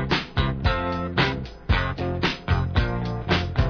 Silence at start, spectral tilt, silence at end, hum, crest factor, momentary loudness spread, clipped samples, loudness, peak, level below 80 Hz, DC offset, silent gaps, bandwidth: 0 s; -6.5 dB/octave; 0 s; none; 16 dB; 3 LU; under 0.1%; -25 LUFS; -6 dBFS; -30 dBFS; under 0.1%; none; 5.4 kHz